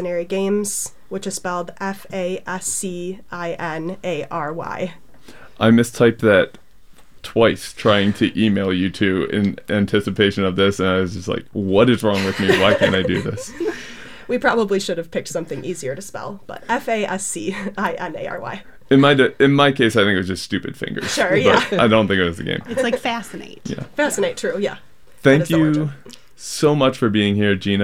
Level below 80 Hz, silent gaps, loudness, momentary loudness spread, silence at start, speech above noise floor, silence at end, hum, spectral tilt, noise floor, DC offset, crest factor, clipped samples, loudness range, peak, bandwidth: -50 dBFS; none; -19 LUFS; 13 LU; 0 s; 29 dB; 0 s; none; -5 dB/octave; -48 dBFS; 0.8%; 18 dB; under 0.1%; 8 LU; -2 dBFS; 16.5 kHz